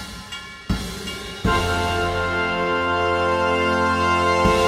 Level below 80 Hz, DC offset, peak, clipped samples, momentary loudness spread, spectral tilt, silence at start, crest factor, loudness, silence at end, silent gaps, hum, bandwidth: -36 dBFS; under 0.1%; -6 dBFS; under 0.1%; 12 LU; -5 dB/octave; 0 s; 16 dB; -21 LUFS; 0 s; none; none; 16 kHz